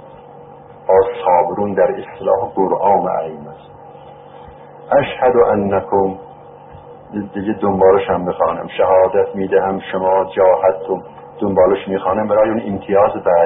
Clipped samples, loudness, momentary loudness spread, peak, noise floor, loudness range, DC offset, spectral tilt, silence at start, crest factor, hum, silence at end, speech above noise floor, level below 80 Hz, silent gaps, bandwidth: under 0.1%; -15 LUFS; 11 LU; -2 dBFS; -38 dBFS; 3 LU; under 0.1%; -5.5 dB/octave; 0 s; 14 dB; none; 0 s; 23 dB; -48 dBFS; none; 3.9 kHz